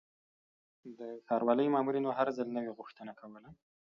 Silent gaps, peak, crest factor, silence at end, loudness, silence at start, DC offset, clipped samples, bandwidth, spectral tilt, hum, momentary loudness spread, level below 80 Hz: none; -16 dBFS; 20 dB; 0.45 s; -33 LUFS; 0.85 s; under 0.1%; under 0.1%; 7 kHz; -5.5 dB/octave; none; 21 LU; -80 dBFS